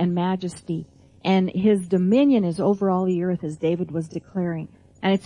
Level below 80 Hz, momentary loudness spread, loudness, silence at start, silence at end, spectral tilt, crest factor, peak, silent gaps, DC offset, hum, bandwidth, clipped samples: -60 dBFS; 12 LU; -23 LUFS; 0 s; 0.05 s; -7.5 dB/octave; 14 dB; -8 dBFS; none; under 0.1%; none; 11 kHz; under 0.1%